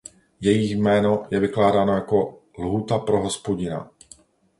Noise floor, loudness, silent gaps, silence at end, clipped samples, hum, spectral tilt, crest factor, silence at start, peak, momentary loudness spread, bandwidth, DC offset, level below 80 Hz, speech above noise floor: -52 dBFS; -22 LUFS; none; 0.75 s; under 0.1%; none; -6 dB/octave; 18 dB; 0.4 s; -4 dBFS; 11 LU; 11.5 kHz; under 0.1%; -50 dBFS; 31 dB